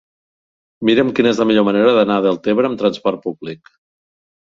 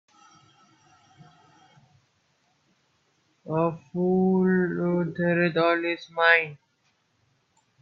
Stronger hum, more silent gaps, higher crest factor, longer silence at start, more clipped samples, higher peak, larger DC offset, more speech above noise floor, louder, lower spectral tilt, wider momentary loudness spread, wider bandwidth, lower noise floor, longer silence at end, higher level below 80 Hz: neither; neither; second, 16 dB vs 24 dB; second, 0.8 s vs 3.45 s; neither; about the same, -2 dBFS vs -4 dBFS; neither; first, over 75 dB vs 46 dB; first, -15 LUFS vs -24 LUFS; second, -6.5 dB/octave vs -8 dB/octave; first, 13 LU vs 9 LU; first, 7.6 kHz vs 6.2 kHz; first, under -90 dBFS vs -70 dBFS; second, 0.95 s vs 1.25 s; first, -58 dBFS vs -72 dBFS